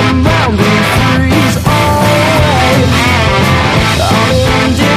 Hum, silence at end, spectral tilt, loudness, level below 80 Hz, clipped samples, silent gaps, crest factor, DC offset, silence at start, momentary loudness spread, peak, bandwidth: none; 0 s; -5 dB/octave; -9 LUFS; -22 dBFS; 0.4%; none; 8 dB; under 0.1%; 0 s; 1 LU; 0 dBFS; 15.5 kHz